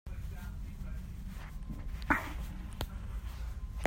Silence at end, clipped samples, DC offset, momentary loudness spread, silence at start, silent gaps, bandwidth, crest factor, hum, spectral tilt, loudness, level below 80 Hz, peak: 0 s; under 0.1%; under 0.1%; 12 LU; 0.05 s; none; 16 kHz; 24 dB; none; -5.5 dB/octave; -41 LUFS; -42 dBFS; -14 dBFS